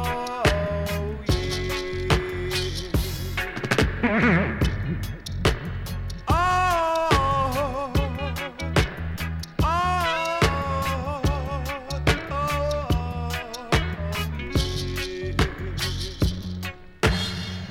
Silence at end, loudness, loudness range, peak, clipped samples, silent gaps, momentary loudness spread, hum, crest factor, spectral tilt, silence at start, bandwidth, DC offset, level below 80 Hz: 0 s; -25 LUFS; 3 LU; -4 dBFS; under 0.1%; none; 9 LU; none; 20 dB; -5 dB/octave; 0 s; 17.5 kHz; under 0.1%; -32 dBFS